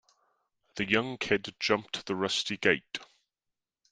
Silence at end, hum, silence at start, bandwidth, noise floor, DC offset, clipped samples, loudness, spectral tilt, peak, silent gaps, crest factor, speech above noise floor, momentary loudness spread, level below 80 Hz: 0.85 s; none; 0.75 s; 10 kHz; -88 dBFS; under 0.1%; under 0.1%; -29 LUFS; -3.5 dB/octave; -8 dBFS; none; 26 dB; 58 dB; 11 LU; -66 dBFS